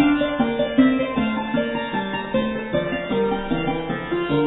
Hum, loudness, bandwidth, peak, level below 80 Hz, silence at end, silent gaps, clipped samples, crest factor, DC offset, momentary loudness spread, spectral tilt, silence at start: none; -22 LUFS; 4.1 kHz; -4 dBFS; -42 dBFS; 0 s; none; under 0.1%; 16 dB; under 0.1%; 7 LU; -10 dB/octave; 0 s